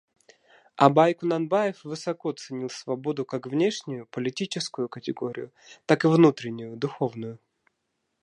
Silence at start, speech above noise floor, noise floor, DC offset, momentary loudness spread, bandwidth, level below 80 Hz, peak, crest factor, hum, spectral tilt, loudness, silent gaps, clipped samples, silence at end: 0.8 s; 53 dB; -78 dBFS; under 0.1%; 16 LU; 10.5 kHz; -76 dBFS; -2 dBFS; 24 dB; none; -6 dB/octave; -26 LUFS; none; under 0.1%; 0.85 s